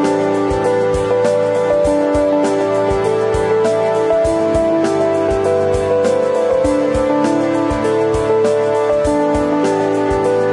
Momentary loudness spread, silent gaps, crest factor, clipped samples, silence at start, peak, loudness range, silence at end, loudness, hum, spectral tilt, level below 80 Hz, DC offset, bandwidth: 1 LU; none; 12 dB; under 0.1%; 0 s; -2 dBFS; 0 LU; 0 s; -15 LUFS; none; -6 dB/octave; -34 dBFS; under 0.1%; 11.5 kHz